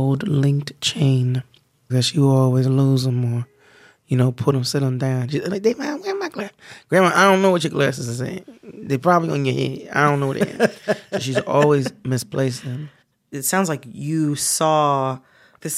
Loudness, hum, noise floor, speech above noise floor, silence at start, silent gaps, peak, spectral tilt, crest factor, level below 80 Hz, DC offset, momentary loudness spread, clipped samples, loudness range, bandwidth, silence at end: -20 LUFS; none; -51 dBFS; 32 dB; 0 s; none; -2 dBFS; -5.5 dB/octave; 18 dB; -62 dBFS; under 0.1%; 11 LU; under 0.1%; 3 LU; 15 kHz; 0 s